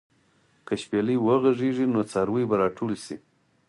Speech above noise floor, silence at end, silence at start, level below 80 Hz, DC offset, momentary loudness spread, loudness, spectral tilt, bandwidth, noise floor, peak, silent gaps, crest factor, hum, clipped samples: 40 dB; 0.5 s; 0.7 s; -62 dBFS; under 0.1%; 12 LU; -25 LUFS; -7 dB/octave; 11.5 kHz; -64 dBFS; -10 dBFS; none; 16 dB; none; under 0.1%